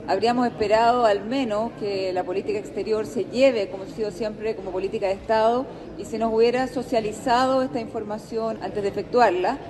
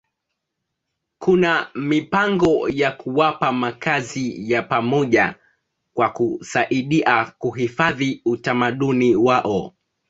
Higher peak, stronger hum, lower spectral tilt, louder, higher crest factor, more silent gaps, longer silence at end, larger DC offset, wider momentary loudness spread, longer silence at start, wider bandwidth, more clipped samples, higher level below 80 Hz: second, -6 dBFS vs -2 dBFS; neither; about the same, -5 dB/octave vs -6 dB/octave; second, -23 LUFS vs -20 LUFS; about the same, 16 dB vs 18 dB; neither; second, 0 s vs 0.4 s; neither; first, 10 LU vs 7 LU; second, 0 s vs 1.2 s; first, 12.5 kHz vs 8 kHz; neither; about the same, -52 dBFS vs -56 dBFS